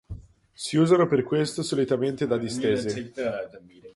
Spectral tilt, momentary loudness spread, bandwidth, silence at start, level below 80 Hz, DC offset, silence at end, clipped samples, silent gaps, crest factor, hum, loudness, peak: -6 dB/octave; 15 LU; 11.5 kHz; 0.1 s; -54 dBFS; under 0.1%; 0.05 s; under 0.1%; none; 18 dB; none; -25 LUFS; -8 dBFS